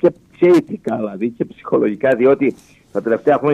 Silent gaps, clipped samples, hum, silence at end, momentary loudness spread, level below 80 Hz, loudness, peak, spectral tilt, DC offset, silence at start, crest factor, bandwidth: none; under 0.1%; none; 0 s; 10 LU; -60 dBFS; -17 LUFS; -2 dBFS; -8 dB/octave; under 0.1%; 0.05 s; 14 dB; 9.4 kHz